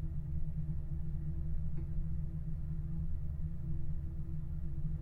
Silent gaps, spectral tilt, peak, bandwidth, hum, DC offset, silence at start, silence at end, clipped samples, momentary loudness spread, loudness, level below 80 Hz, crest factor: none; -11 dB/octave; -24 dBFS; 2 kHz; none; under 0.1%; 0 s; 0 s; under 0.1%; 2 LU; -42 LUFS; -40 dBFS; 10 dB